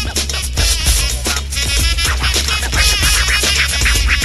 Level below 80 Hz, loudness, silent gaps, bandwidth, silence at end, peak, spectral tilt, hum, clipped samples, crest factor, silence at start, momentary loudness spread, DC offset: -18 dBFS; -13 LUFS; none; 13 kHz; 0 s; 0 dBFS; -1.5 dB/octave; none; under 0.1%; 14 dB; 0 s; 6 LU; under 0.1%